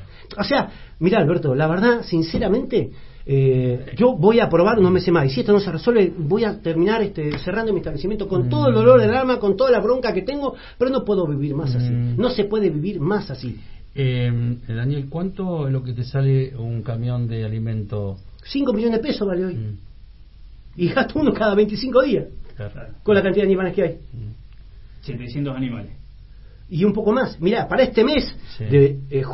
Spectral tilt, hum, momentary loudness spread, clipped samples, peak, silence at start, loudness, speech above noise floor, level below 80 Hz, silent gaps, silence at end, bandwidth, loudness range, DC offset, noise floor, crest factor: -11 dB/octave; none; 15 LU; under 0.1%; 0 dBFS; 0 s; -20 LUFS; 23 dB; -40 dBFS; none; 0 s; 5.8 kHz; 7 LU; under 0.1%; -42 dBFS; 20 dB